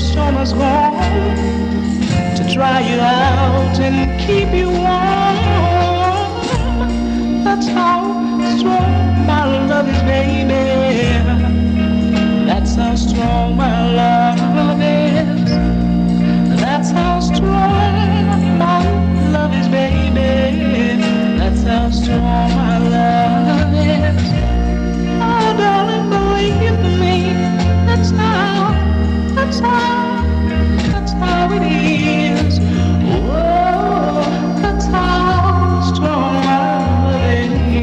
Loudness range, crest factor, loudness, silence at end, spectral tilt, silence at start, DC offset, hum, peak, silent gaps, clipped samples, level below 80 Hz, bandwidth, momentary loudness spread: 1 LU; 12 dB; -14 LUFS; 0 s; -7 dB/octave; 0 s; under 0.1%; none; -2 dBFS; none; under 0.1%; -22 dBFS; 8.8 kHz; 3 LU